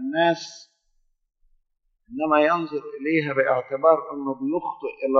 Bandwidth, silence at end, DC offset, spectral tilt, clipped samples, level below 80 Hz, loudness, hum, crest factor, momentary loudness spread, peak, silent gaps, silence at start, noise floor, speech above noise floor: 7.2 kHz; 0 s; under 0.1%; -5.5 dB/octave; under 0.1%; -68 dBFS; -23 LUFS; none; 20 dB; 11 LU; -4 dBFS; none; 0 s; -71 dBFS; 49 dB